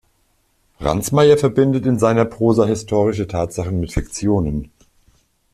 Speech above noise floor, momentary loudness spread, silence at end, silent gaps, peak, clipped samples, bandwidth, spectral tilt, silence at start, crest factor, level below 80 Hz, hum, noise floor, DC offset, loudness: 46 dB; 10 LU; 0.9 s; none; -2 dBFS; under 0.1%; 14.5 kHz; -6.5 dB/octave; 0.8 s; 16 dB; -38 dBFS; none; -62 dBFS; under 0.1%; -18 LUFS